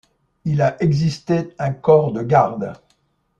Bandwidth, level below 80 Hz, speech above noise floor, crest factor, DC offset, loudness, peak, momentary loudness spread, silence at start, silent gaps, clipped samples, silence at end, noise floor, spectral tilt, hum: 7.8 kHz; -52 dBFS; 47 dB; 18 dB; under 0.1%; -18 LUFS; -2 dBFS; 12 LU; 0.45 s; none; under 0.1%; 0.65 s; -64 dBFS; -8 dB/octave; none